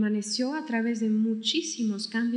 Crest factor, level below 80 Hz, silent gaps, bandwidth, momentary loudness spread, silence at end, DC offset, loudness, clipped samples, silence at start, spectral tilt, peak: 14 dB; under -90 dBFS; none; 10.5 kHz; 3 LU; 0 s; under 0.1%; -28 LUFS; under 0.1%; 0 s; -4 dB/octave; -12 dBFS